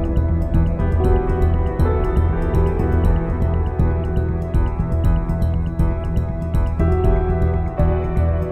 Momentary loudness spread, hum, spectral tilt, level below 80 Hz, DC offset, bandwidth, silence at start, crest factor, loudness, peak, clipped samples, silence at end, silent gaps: 3 LU; none; -10 dB/octave; -20 dBFS; under 0.1%; 4.1 kHz; 0 s; 12 dB; -20 LUFS; -4 dBFS; under 0.1%; 0 s; none